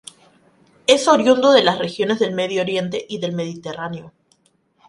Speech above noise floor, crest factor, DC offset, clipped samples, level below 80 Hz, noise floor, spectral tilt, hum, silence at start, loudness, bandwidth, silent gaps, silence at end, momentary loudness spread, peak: 44 dB; 20 dB; under 0.1%; under 0.1%; -62 dBFS; -62 dBFS; -4 dB/octave; none; 0.9 s; -18 LUFS; 11.5 kHz; none; 0.8 s; 15 LU; 0 dBFS